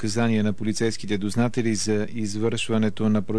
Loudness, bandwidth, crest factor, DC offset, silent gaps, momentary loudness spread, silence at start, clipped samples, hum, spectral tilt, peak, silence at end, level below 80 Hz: -24 LUFS; 11 kHz; 12 dB; 3%; none; 4 LU; 0 s; under 0.1%; none; -5.5 dB/octave; -12 dBFS; 0 s; -56 dBFS